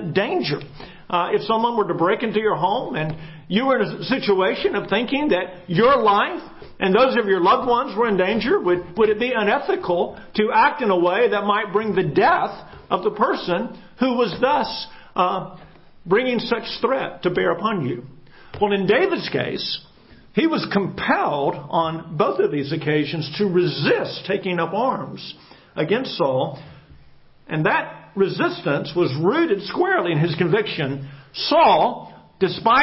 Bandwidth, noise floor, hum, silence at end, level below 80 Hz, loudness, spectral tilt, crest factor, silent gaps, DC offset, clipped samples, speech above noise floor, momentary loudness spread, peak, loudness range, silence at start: 5.8 kHz; -48 dBFS; none; 0 s; -54 dBFS; -20 LUFS; -10 dB/octave; 18 dB; none; under 0.1%; under 0.1%; 28 dB; 10 LU; -2 dBFS; 4 LU; 0 s